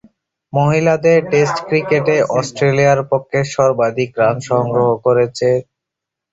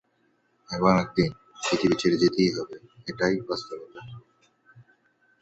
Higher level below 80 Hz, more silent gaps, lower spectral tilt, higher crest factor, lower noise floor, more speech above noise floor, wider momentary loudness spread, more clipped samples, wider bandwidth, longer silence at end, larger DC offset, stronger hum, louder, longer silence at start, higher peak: first, -52 dBFS vs -58 dBFS; neither; about the same, -6 dB/octave vs -5.5 dB/octave; second, 14 dB vs 22 dB; first, -82 dBFS vs -69 dBFS; first, 68 dB vs 43 dB; second, 5 LU vs 18 LU; neither; about the same, 8 kHz vs 8.2 kHz; about the same, 0.7 s vs 0.6 s; neither; neither; first, -15 LUFS vs -25 LUFS; second, 0.55 s vs 0.7 s; first, -2 dBFS vs -6 dBFS